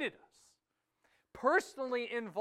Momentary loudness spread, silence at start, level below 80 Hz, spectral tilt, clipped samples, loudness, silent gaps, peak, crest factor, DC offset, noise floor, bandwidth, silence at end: 7 LU; 0 s; -76 dBFS; -3.5 dB/octave; under 0.1%; -35 LUFS; none; -16 dBFS; 22 dB; under 0.1%; -84 dBFS; 14 kHz; 0 s